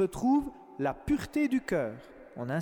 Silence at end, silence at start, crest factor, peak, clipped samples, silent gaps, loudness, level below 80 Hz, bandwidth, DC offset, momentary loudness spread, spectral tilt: 0 s; 0 s; 12 dB; -18 dBFS; under 0.1%; none; -31 LUFS; -52 dBFS; 17 kHz; under 0.1%; 14 LU; -7 dB/octave